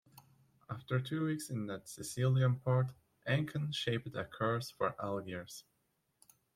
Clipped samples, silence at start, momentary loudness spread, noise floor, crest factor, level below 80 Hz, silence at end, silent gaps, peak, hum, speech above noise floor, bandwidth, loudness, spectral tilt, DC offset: under 0.1%; 0.15 s; 14 LU; -80 dBFS; 18 dB; -72 dBFS; 0.95 s; none; -18 dBFS; none; 44 dB; 15 kHz; -37 LUFS; -6 dB/octave; under 0.1%